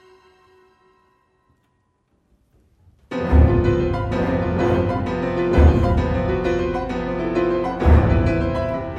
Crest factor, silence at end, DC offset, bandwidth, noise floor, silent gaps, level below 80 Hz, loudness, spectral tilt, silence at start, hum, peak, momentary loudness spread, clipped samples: 18 dB; 0 s; under 0.1%; 7 kHz; -66 dBFS; none; -24 dBFS; -19 LUFS; -9 dB/octave; 3.1 s; none; -2 dBFS; 8 LU; under 0.1%